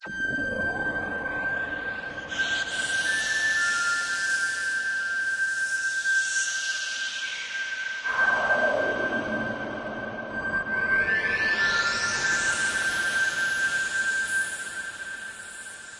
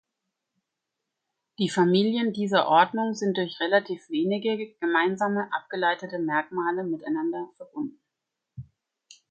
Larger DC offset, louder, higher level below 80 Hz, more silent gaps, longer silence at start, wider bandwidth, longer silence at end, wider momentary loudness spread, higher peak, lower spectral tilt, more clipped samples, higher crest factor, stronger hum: neither; about the same, -25 LUFS vs -26 LUFS; first, -58 dBFS vs -70 dBFS; neither; second, 0 s vs 1.6 s; first, 11.5 kHz vs 9 kHz; second, 0 s vs 0.7 s; second, 10 LU vs 14 LU; second, -12 dBFS vs -6 dBFS; second, -1 dB/octave vs -5.5 dB/octave; neither; second, 14 dB vs 22 dB; neither